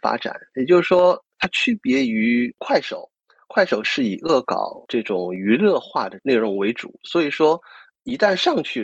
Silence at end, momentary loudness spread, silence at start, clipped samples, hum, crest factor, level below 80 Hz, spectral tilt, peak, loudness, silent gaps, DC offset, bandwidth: 0 s; 9 LU; 0.05 s; under 0.1%; none; 16 dB; -64 dBFS; -5.5 dB/octave; -4 dBFS; -20 LUFS; none; under 0.1%; 8.4 kHz